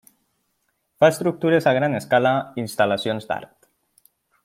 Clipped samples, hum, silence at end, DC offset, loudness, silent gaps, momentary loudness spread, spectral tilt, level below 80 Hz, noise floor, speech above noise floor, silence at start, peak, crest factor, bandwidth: under 0.1%; none; 1 s; under 0.1%; -21 LUFS; none; 10 LU; -5.5 dB/octave; -66 dBFS; -72 dBFS; 52 dB; 1 s; -2 dBFS; 20 dB; 16 kHz